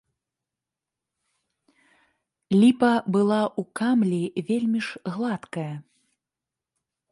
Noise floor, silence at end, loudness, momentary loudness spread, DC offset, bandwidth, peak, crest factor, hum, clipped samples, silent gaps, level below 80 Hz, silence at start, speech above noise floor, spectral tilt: -88 dBFS; 1.3 s; -24 LUFS; 13 LU; under 0.1%; 11.5 kHz; -8 dBFS; 18 dB; none; under 0.1%; none; -70 dBFS; 2.5 s; 65 dB; -7 dB/octave